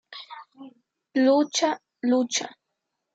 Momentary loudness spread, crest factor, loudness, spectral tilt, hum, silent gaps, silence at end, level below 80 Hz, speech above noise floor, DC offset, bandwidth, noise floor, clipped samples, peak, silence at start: 20 LU; 16 dB; -24 LUFS; -2 dB/octave; none; none; 0.65 s; -86 dBFS; 59 dB; under 0.1%; 9.2 kHz; -81 dBFS; under 0.1%; -10 dBFS; 0.1 s